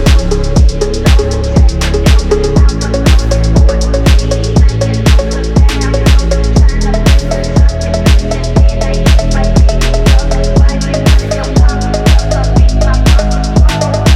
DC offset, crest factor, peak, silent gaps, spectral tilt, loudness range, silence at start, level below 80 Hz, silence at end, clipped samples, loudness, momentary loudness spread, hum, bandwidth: under 0.1%; 8 dB; 0 dBFS; none; -6 dB/octave; 0 LU; 0 s; -10 dBFS; 0 s; under 0.1%; -10 LUFS; 2 LU; none; 13 kHz